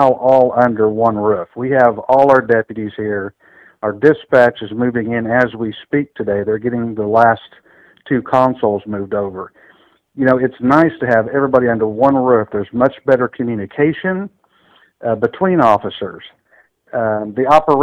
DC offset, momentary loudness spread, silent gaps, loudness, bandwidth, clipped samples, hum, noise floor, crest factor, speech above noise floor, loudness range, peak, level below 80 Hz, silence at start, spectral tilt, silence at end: under 0.1%; 11 LU; none; -15 LUFS; 8.6 kHz; 0.3%; none; -54 dBFS; 14 dB; 39 dB; 4 LU; 0 dBFS; -52 dBFS; 0 s; -8 dB/octave; 0 s